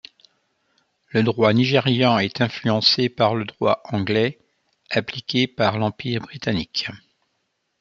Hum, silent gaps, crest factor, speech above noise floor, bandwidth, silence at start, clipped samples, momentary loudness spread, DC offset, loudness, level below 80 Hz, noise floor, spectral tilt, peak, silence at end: none; none; 20 dB; 52 dB; 7.4 kHz; 1.15 s; under 0.1%; 8 LU; under 0.1%; -21 LUFS; -60 dBFS; -73 dBFS; -6 dB/octave; -2 dBFS; 0.85 s